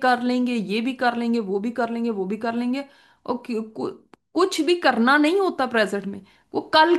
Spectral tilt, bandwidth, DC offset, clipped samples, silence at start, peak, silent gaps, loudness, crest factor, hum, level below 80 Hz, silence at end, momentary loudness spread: -4.5 dB/octave; 12.5 kHz; under 0.1%; under 0.1%; 0 s; -4 dBFS; none; -23 LUFS; 18 dB; none; -70 dBFS; 0 s; 13 LU